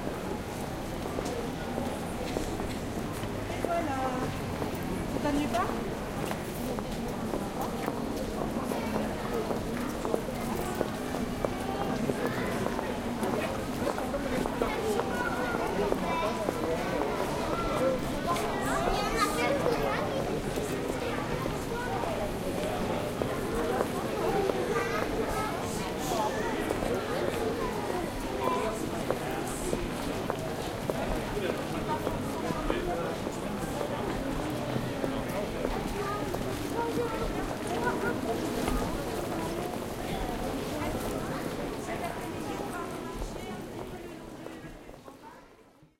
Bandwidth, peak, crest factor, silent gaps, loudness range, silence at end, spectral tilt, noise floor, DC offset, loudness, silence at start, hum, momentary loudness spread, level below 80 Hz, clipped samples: 16.5 kHz; -12 dBFS; 20 dB; none; 4 LU; 0.15 s; -5 dB/octave; -57 dBFS; under 0.1%; -32 LUFS; 0 s; none; 6 LU; -44 dBFS; under 0.1%